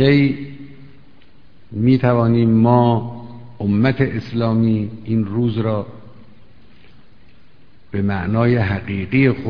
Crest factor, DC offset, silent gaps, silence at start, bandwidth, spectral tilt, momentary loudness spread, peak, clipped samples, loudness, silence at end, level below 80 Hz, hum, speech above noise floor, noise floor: 18 dB; 1%; none; 0 s; 5.4 kHz; -10 dB/octave; 16 LU; 0 dBFS; under 0.1%; -18 LUFS; 0 s; -46 dBFS; none; 35 dB; -51 dBFS